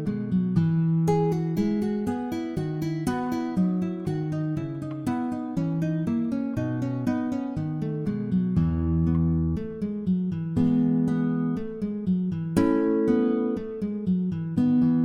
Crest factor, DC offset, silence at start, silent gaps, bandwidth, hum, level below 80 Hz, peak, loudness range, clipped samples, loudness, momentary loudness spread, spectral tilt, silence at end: 16 dB; under 0.1%; 0 s; none; 12 kHz; none; -48 dBFS; -10 dBFS; 3 LU; under 0.1%; -26 LUFS; 7 LU; -9 dB/octave; 0 s